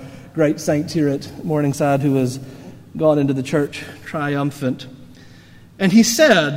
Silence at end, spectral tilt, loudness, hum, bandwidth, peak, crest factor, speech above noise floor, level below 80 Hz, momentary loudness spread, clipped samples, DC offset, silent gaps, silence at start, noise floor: 0 s; -5 dB/octave; -18 LUFS; none; 16 kHz; 0 dBFS; 18 dB; 26 dB; -54 dBFS; 18 LU; under 0.1%; under 0.1%; none; 0 s; -44 dBFS